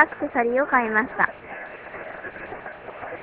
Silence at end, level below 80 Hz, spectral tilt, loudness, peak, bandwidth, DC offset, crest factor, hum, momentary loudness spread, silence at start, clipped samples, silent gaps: 0 s; -58 dBFS; -8.5 dB/octave; -22 LUFS; 0 dBFS; 4 kHz; under 0.1%; 24 dB; none; 16 LU; 0 s; under 0.1%; none